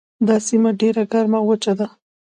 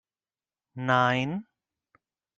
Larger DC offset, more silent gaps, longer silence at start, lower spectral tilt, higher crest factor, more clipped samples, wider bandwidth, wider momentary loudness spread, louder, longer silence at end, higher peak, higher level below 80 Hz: neither; neither; second, 0.2 s vs 0.75 s; about the same, -5.5 dB/octave vs -6 dB/octave; second, 14 dB vs 22 dB; neither; first, 9.6 kHz vs 7.6 kHz; second, 6 LU vs 15 LU; first, -18 LUFS vs -26 LUFS; second, 0.35 s vs 0.95 s; first, -4 dBFS vs -8 dBFS; about the same, -68 dBFS vs -70 dBFS